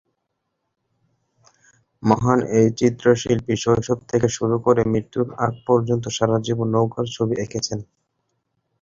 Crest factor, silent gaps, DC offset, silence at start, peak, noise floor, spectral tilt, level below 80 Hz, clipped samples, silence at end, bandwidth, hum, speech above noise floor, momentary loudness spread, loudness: 20 dB; none; under 0.1%; 2 s; -2 dBFS; -76 dBFS; -6 dB/octave; -50 dBFS; under 0.1%; 1 s; 7.8 kHz; none; 56 dB; 7 LU; -20 LUFS